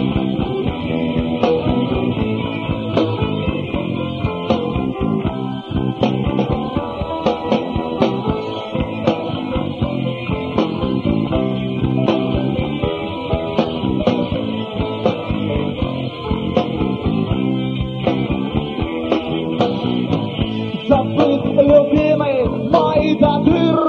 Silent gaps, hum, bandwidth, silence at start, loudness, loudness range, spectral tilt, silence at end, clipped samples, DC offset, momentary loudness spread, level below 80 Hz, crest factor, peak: none; none; 7 kHz; 0 s; -19 LUFS; 5 LU; -8.5 dB/octave; 0 s; under 0.1%; under 0.1%; 7 LU; -34 dBFS; 18 dB; 0 dBFS